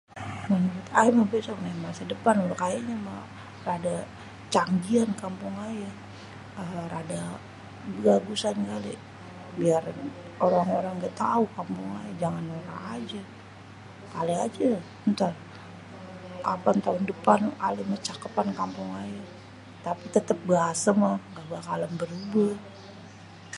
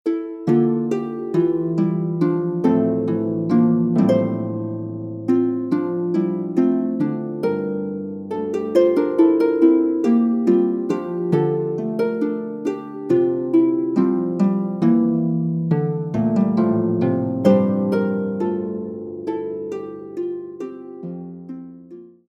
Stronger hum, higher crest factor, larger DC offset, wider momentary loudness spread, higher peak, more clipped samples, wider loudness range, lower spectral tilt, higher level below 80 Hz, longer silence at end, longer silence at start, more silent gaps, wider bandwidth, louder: neither; first, 24 dB vs 16 dB; neither; first, 20 LU vs 13 LU; about the same, -4 dBFS vs -2 dBFS; neither; about the same, 4 LU vs 4 LU; second, -6 dB/octave vs -10 dB/octave; about the same, -62 dBFS vs -62 dBFS; second, 0 s vs 0.25 s; about the same, 0.1 s vs 0.05 s; neither; first, 11.5 kHz vs 7.4 kHz; second, -28 LUFS vs -20 LUFS